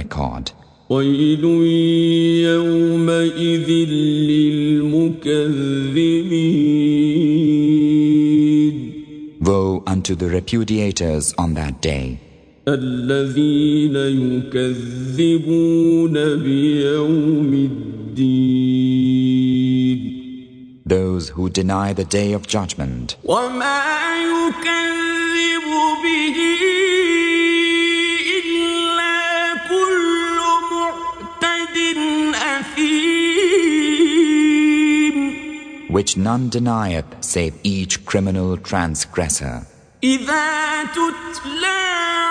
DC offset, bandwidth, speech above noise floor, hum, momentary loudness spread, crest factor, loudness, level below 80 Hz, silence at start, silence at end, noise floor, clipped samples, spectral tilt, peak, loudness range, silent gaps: under 0.1%; 10 kHz; 21 dB; none; 8 LU; 16 dB; -17 LUFS; -42 dBFS; 0 s; 0 s; -38 dBFS; under 0.1%; -5 dB/octave; -2 dBFS; 5 LU; none